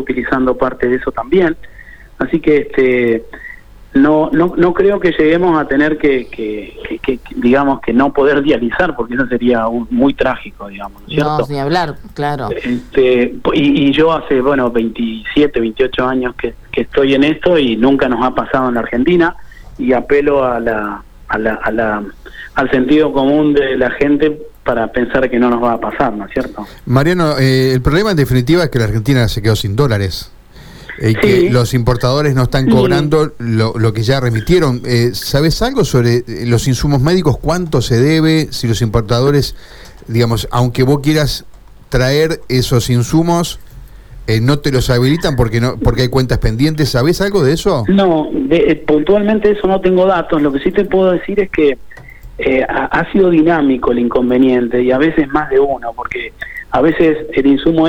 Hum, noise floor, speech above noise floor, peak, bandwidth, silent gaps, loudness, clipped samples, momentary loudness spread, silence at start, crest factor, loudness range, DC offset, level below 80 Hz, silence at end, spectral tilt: none; -35 dBFS; 23 dB; 0 dBFS; 18.5 kHz; none; -13 LUFS; under 0.1%; 9 LU; 0 s; 12 dB; 3 LU; under 0.1%; -30 dBFS; 0 s; -6.5 dB/octave